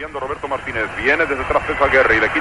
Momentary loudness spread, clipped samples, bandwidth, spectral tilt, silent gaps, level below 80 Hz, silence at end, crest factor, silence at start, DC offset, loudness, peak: 11 LU; under 0.1%; 11.5 kHz; -5 dB/octave; none; -38 dBFS; 0 s; 16 dB; 0 s; 0.3%; -17 LUFS; -2 dBFS